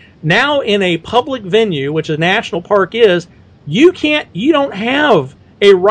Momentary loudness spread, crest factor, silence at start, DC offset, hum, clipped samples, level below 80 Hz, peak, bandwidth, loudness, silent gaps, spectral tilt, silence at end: 5 LU; 12 dB; 0.25 s; under 0.1%; none; 0.5%; -50 dBFS; 0 dBFS; 9.4 kHz; -13 LUFS; none; -5.5 dB/octave; 0 s